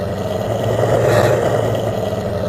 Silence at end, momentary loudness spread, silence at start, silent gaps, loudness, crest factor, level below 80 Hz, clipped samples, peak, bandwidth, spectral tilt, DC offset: 0 s; 7 LU; 0 s; none; -17 LUFS; 16 dB; -40 dBFS; under 0.1%; 0 dBFS; 15 kHz; -6.5 dB/octave; under 0.1%